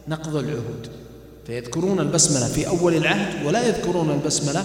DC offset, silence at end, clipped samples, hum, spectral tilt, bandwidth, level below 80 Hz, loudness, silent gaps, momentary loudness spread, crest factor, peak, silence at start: under 0.1%; 0 s; under 0.1%; none; -4 dB/octave; 16.5 kHz; -46 dBFS; -21 LUFS; none; 16 LU; 18 dB; -4 dBFS; 0 s